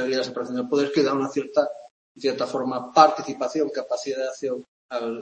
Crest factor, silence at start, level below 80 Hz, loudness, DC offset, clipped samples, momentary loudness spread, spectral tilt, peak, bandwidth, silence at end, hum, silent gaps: 24 dB; 0 s; -72 dBFS; -24 LUFS; under 0.1%; under 0.1%; 13 LU; -4.5 dB/octave; 0 dBFS; 8.8 kHz; 0 s; none; 1.91-2.15 s, 4.68-4.89 s